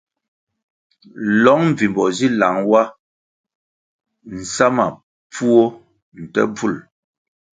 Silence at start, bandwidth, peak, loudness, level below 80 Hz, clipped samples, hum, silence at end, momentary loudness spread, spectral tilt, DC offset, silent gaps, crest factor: 1.15 s; 9.4 kHz; 0 dBFS; -17 LUFS; -58 dBFS; under 0.1%; none; 0.75 s; 15 LU; -5.5 dB/octave; under 0.1%; 3.00-3.44 s, 3.55-3.99 s, 5.03-5.30 s, 6.02-6.12 s; 18 dB